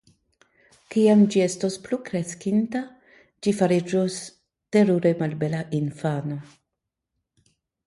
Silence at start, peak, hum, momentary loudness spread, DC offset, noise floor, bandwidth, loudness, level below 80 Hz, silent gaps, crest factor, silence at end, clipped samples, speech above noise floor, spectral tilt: 0.9 s; -6 dBFS; none; 13 LU; under 0.1%; -83 dBFS; 11.5 kHz; -23 LUFS; -66 dBFS; none; 18 dB; 1.45 s; under 0.1%; 61 dB; -6.5 dB/octave